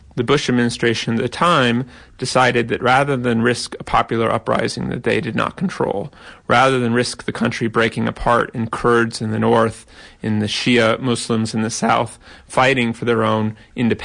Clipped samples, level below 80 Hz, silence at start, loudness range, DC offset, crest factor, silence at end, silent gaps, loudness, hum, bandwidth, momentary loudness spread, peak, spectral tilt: under 0.1%; -44 dBFS; 0.15 s; 2 LU; under 0.1%; 14 dB; 0 s; none; -18 LUFS; none; 10.5 kHz; 8 LU; -4 dBFS; -5 dB/octave